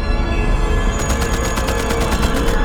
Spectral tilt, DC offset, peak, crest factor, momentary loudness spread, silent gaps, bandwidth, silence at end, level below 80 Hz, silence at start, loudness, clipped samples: -5 dB/octave; under 0.1%; -2 dBFS; 14 dB; 2 LU; none; 18.5 kHz; 0 s; -18 dBFS; 0 s; -19 LUFS; under 0.1%